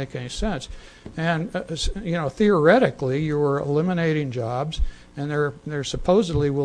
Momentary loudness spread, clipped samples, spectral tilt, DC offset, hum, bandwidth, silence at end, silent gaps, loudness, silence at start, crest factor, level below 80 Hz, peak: 13 LU; under 0.1%; -6 dB/octave; under 0.1%; none; 10.5 kHz; 0 s; none; -23 LUFS; 0 s; 18 dB; -34 dBFS; -4 dBFS